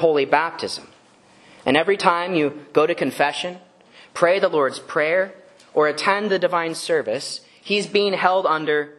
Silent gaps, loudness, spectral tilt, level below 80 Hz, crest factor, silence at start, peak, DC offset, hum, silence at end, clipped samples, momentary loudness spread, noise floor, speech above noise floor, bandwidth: none; -20 LUFS; -4 dB/octave; -68 dBFS; 20 dB; 0 s; 0 dBFS; under 0.1%; none; 0.05 s; under 0.1%; 10 LU; -52 dBFS; 32 dB; 12.5 kHz